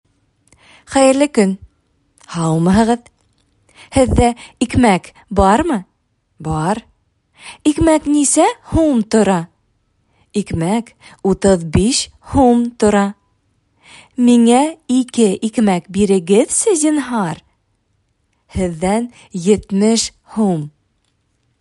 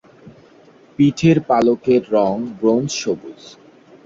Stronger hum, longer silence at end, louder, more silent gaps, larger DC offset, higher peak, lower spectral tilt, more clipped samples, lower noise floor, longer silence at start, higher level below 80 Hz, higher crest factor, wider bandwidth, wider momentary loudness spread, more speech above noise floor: neither; first, 0.9 s vs 0.75 s; about the same, -15 LUFS vs -17 LUFS; neither; neither; about the same, 0 dBFS vs -2 dBFS; second, -5 dB/octave vs -6.5 dB/octave; neither; first, -64 dBFS vs -48 dBFS; first, 0.9 s vs 0.25 s; first, -36 dBFS vs -54 dBFS; about the same, 16 dB vs 16 dB; first, 11.5 kHz vs 7.8 kHz; about the same, 10 LU vs 11 LU; first, 50 dB vs 31 dB